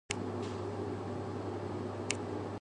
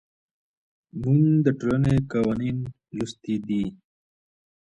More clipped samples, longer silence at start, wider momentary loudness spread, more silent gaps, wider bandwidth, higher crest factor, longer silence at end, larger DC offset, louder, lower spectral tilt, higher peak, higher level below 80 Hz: neither; second, 0.1 s vs 0.95 s; second, 3 LU vs 13 LU; neither; first, 11 kHz vs 9.8 kHz; first, 28 dB vs 18 dB; second, 0 s vs 0.95 s; neither; second, -39 LUFS vs -24 LUFS; second, -5 dB/octave vs -8.5 dB/octave; second, -12 dBFS vs -8 dBFS; second, -58 dBFS vs -50 dBFS